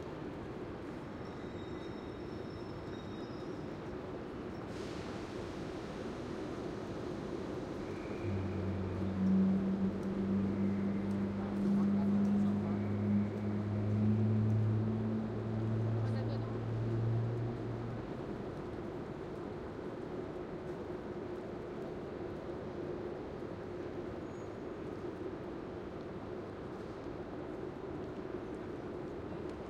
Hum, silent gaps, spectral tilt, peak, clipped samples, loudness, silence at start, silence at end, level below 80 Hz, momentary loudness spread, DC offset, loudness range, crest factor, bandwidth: none; none; -8.5 dB/octave; -22 dBFS; under 0.1%; -39 LUFS; 0 s; 0 s; -58 dBFS; 12 LU; under 0.1%; 10 LU; 16 dB; 8.8 kHz